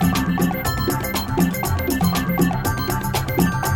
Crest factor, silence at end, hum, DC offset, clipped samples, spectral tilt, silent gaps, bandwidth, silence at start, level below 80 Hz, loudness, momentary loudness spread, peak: 16 dB; 0 s; none; 0.2%; under 0.1%; -5.5 dB/octave; none; 19.5 kHz; 0 s; -34 dBFS; -21 LUFS; 3 LU; -4 dBFS